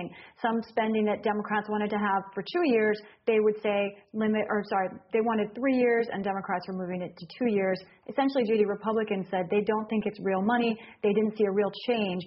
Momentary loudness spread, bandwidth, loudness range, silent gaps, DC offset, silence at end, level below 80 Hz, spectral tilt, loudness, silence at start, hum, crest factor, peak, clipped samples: 7 LU; 5.8 kHz; 1 LU; none; under 0.1%; 0 s; -70 dBFS; -4.5 dB/octave; -28 LUFS; 0 s; none; 16 dB; -12 dBFS; under 0.1%